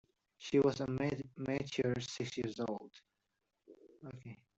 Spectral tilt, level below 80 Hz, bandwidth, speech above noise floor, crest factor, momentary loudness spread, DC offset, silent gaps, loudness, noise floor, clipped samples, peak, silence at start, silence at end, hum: -6 dB/octave; -68 dBFS; 8.2 kHz; 49 dB; 20 dB; 20 LU; under 0.1%; none; -37 LUFS; -86 dBFS; under 0.1%; -20 dBFS; 0.4 s; 0.25 s; none